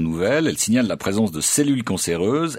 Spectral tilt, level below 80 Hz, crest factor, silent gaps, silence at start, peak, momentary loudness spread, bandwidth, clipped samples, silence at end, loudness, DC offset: -4 dB/octave; -50 dBFS; 14 dB; none; 0 s; -6 dBFS; 3 LU; 16.5 kHz; under 0.1%; 0 s; -20 LUFS; under 0.1%